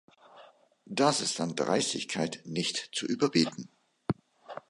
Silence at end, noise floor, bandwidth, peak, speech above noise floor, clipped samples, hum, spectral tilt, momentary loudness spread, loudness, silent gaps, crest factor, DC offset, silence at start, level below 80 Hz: 0.1 s; -57 dBFS; 11.5 kHz; -10 dBFS; 27 dB; under 0.1%; none; -3.5 dB/octave; 13 LU; -30 LUFS; none; 22 dB; under 0.1%; 0.35 s; -68 dBFS